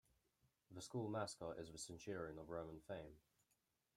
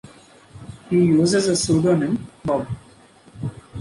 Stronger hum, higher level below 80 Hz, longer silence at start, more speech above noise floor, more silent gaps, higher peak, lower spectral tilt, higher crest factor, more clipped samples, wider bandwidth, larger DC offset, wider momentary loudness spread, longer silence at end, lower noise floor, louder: neither; second, -76 dBFS vs -50 dBFS; first, 0.7 s vs 0.05 s; first, 36 dB vs 31 dB; neither; second, -32 dBFS vs -8 dBFS; about the same, -5 dB/octave vs -5.5 dB/octave; first, 20 dB vs 14 dB; neither; first, 16 kHz vs 11.5 kHz; neither; second, 9 LU vs 17 LU; first, 0.75 s vs 0 s; first, -87 dBFS vs -49 dBFS; second, -51 LUFS vs -19 LUFS